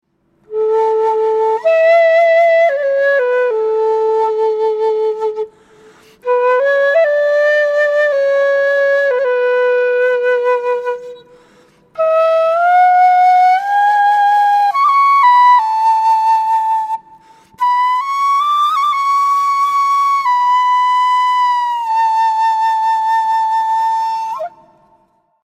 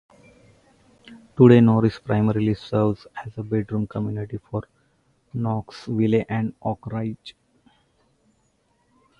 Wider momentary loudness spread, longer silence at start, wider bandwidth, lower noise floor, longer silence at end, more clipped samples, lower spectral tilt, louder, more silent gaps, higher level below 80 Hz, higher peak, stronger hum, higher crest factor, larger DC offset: second, 8 LU vs 18 LU; second, 0.5 s vs 1.1 s; first, 15 kHz vs 7.2 kHz; second, -56 dBFS vs -66 dBFS; second, 1 s vs 1.9 s; neither; second, -1 dB/octave vs -9.5 dB/octave; first, -13 LUFS vs -22 LUFS; neither; second, -68 dBFS vs -52 dBFS; about the same, -2 dBFS vs -2 dBFS; neither; second, 12 dB vs 22 dB; neither